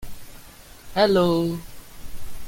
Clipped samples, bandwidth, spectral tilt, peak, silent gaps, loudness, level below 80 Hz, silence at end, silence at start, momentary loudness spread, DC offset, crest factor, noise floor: under 0.1%; 17 kHz; -6 dB/octave; -6 dBFS; none; -21 LUFS; -42 dBFS; 0 s; 0 s; 26 LU; under 0.1%; 18 dB; -44 dBFS